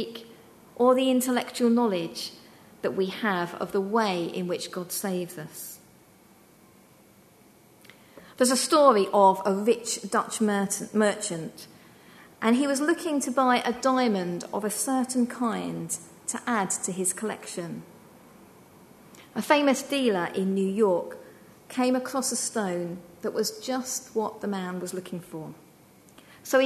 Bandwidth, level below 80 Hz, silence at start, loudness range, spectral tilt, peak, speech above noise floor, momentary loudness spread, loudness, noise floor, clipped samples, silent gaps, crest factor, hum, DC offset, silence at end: 13.5 kHz; -72 dBFS; 0 s; 9 LU; -4 dB/octave; -4 dBFS; 30 dB; 15 LU; -26 LUFS; -56 dBFS; under 0.1%; none; 22 dB; none; under 0.1%; 0 s